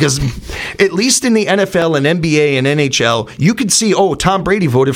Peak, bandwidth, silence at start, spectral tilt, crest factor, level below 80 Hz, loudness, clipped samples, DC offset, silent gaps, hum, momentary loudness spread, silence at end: 0 dBFS; 16.5 kHz; 0 s; -4 dB/octave; 12 dB; -36 dBFS; -13 LUFS; under 0.1%; under 0.1%; none; none; 4 LU; 0 s